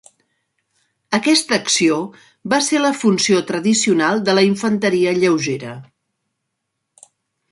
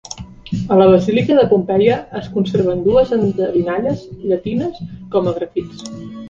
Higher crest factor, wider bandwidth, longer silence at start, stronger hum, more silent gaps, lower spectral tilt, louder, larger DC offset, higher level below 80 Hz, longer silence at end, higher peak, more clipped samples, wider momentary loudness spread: about the same, 18 dB vs 16 dB; first, 11.5 kHz vs 7.6 kHz; first, 1.1 s vs 0.1 s; neither; neither; second, -3.5 dB/octave vs -7.5 dB/octave; about the same, -16 LUFS vs -16 LUFS; neither; second, -64 dBFS vs -44 dBFS; first, 1.7 s vs 0 s; about the same, -2 dBFS vs 0 dBFS; neither; second, 9 LU vs 15 LU